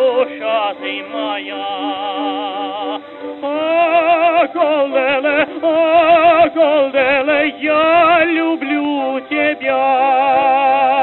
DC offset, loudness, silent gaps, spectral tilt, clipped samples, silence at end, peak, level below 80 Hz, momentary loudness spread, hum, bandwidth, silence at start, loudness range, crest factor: under 0.1%; -14 LUFS; none; -7 dB/octave; under 0.1%; 0 s; 0 dBFS; -60 dBFS; 11 LU; none; 4.2 kHz; 0 s; 8 LU; 14 dB